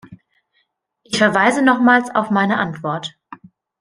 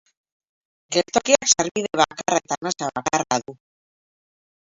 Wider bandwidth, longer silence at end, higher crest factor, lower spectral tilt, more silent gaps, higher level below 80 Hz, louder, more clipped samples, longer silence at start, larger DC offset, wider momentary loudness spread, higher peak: first, 10.5 kHz vs 7.8 kHz; second, 0.45 s vs 1.25 s; second, 18 dB vs 24 dB; first, -5 dB/octave vs -2 dB/octave; second, none vs 1.71-1.75 s; about the same, -62 dBFS vs -60 dBFS; first, -16 LUFS vs -21 LUFS; neither; second, 0.1 s vs 0.9 s; neither; first, 11 LU vs 8 LU; about the same, 0 dBFS vs -2 dBFS